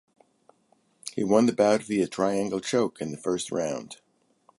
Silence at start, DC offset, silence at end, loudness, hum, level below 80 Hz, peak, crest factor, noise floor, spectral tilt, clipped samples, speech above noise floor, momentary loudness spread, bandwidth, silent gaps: 1.05 s; under 0.1%; 0.65 s; -26 LUFS; none; -66 dBFS; -8 dBFS; 20 dB; -67 dBFS; -5 dB/octave; under 0.1%; 41 dB; 15 LU; 11.5 kHz; none